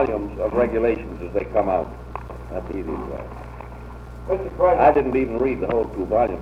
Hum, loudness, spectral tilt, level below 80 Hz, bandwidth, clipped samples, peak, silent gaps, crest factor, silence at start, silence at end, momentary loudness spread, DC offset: none; -22 LUFS; -9 dB/octave; -38 dBFS; 11 kHz; under 0.1%; -4 dBFS; none; 18 dB; 0 s; 0 s; 20 LU; under 0.1%